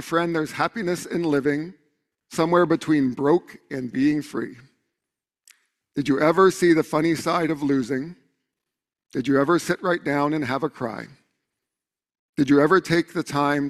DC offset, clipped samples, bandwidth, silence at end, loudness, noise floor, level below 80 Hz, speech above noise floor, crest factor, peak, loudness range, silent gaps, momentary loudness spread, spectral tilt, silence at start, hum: under 0.1%; under 0.1%; 14 kHz; 0 s; -22 LUFS; -88 dBFS; -60 dBFS; 66 dB; 18 dB; -4 dBFS; 3 LU; 12.19-12.33 s; 15 LU; -6 dB/octave; 0 s; none